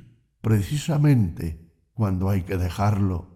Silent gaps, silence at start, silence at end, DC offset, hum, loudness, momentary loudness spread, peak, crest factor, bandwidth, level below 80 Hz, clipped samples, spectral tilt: none; 0.45 s; 0.1 s; under 0.1%; none; -24 LUFS; 14 LU; -8 dBFS; 14 dB; 15.5 kHz; -42 dBFS; under 0.1%; -7.5 dB/octave